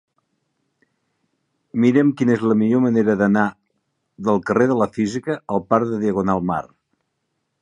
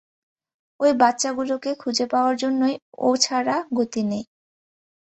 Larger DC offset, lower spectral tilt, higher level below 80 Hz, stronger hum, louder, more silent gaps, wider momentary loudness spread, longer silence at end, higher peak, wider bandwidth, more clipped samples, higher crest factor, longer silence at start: neither; first, -8 dB/octave vs -3 dB/octave; first, -56 dBFS vs -68 dBFS; neither; first, -19 LUFS vs -22 LUFS; second, none vs 2.82-2.92 s; about the same, 8 LU vs 7 LU; about the same, 0.95 s vs 0.9 s; about the same, -2 dBFS vs -2 dBFS; first, 9.8 kHz vs 8.4 kHz; neither; about the same, 18 dB vs 20 dB; first, 1.75 s vs 0.8 s